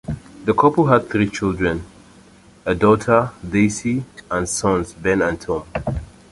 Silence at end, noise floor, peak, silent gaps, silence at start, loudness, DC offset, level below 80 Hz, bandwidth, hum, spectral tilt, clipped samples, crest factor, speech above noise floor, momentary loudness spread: 0.25 s; -47 dBFS; -2 dBFS; none; 0.1 s; -19 LUFS; under 0.1%; -40 dBFS; 11.5 kHz; none; -6 dB/octave; under 0.1%; 18 dB; 29 dB; 10 LU